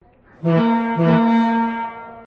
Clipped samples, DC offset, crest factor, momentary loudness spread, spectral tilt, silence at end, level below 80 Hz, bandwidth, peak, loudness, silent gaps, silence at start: under 0.1%; under 0.1%; 14 dB; 11 LU; -9 dB/octave; 0 s; -56 dBFS; 5.2 kHz; -4 dBFS; -18 LUFS; none; 0.4 s